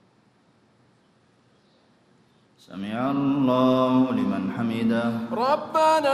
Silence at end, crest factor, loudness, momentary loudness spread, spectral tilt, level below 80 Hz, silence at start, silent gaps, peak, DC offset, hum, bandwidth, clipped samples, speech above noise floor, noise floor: 0 s; 16 dB; -23 LUFS; 8 LU; -6.5 dB/octave; -66 dBFS; 2.7 s; none; -8 dBFS; under 0.1%; none; 13.5 kHz; under 0.1%; 39 dB; -61 dBFS